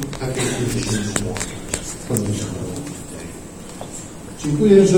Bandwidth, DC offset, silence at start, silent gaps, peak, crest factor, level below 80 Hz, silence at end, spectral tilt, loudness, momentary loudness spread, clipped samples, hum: over 20 kHz; under 0.1%; 0 s; none; 0 dBFS; 20 dB; -40 dBFS; 0 s; -5 dB/octave; -22 LUFS; 14 LU; under 0.1%; none